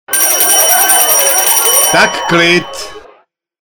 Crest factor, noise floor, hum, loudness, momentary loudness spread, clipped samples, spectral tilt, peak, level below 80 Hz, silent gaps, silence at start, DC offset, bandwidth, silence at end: 10 dB; -49 dBFS; none; -7 LUFS; 9 LU; 0.1%; -1 dB/octave; 0 dBFS; -48 dBFS; none; 0.1 s; under 0.1%; over 20 kHz; 0.65 s